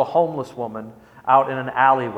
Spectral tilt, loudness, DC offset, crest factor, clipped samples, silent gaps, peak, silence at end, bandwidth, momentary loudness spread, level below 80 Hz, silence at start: -7 dB/octave; -20 LUFS; under 0.1%; 20 dB; under 0.1%; none; -2 dBFS; 0 s; 9.4 kHz; 15 LU; -64 dBFS; 0 s